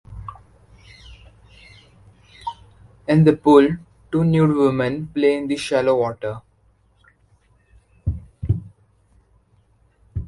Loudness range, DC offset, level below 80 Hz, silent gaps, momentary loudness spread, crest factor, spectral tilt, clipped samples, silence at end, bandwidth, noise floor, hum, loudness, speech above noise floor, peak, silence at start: 15 LU; under 0.1%; -42 dBFS; none; 20 LU; 20 dB; -7.5 dB/octave; under 0.1%; 0 s; 11.5 kHz; -59 dBFS; none; -19 LUFS; 42 dB; -2 dBFS; 0.1 s